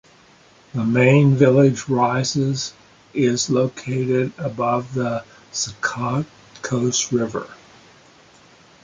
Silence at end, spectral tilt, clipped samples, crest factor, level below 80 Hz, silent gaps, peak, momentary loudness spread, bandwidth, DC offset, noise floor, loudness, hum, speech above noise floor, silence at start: 1.3 s; -5.5 dB/octave; under 0.1%; 18 dB; -58 dBFS; none; -2 dBFS; 16 LU; 9.4 kHz; under 0.1%; -51 dBFS; -20 LUFS; none; 32 dB; 0.75 s